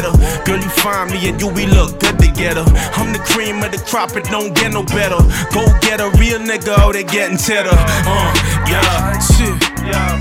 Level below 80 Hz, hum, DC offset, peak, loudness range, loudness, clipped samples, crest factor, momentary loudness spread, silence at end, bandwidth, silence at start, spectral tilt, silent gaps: -16 dBFS; none; under 0.1%; 0 dBFS; 2 LU; -14 LUFS; under 0.1%; 12 dB; 5 LU; 0 s; 17 kHz; 0 s; -4.5 dB/octave; none